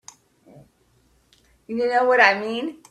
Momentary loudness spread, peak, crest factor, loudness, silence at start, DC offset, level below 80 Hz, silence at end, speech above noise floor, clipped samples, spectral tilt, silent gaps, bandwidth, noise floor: 14 LU; 0 dBFS; 24 dB; -19 LUFS; 1.7 s; under 0.1%; -66 dBFS; 0.15 s; 42 dB; under 0.1%; -3.5 dB/octave; none; 11 kHz; -61 dBFS